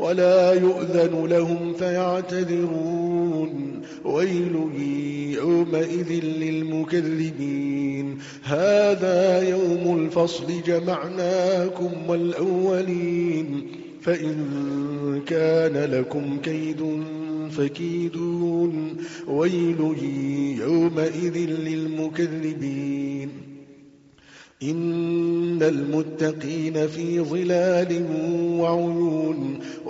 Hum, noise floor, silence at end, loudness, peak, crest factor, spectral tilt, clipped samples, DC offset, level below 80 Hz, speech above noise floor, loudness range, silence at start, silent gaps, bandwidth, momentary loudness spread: none; -51 dBFS; 0 s; -23 LUFS; -8 dBFS; 16 dB; -6.5 dB/octave; under 0.1%; under 0.1%; -64 dBFS; 28 dB; 5 LU; 0 s; none; 7.8 kHz; 8 LU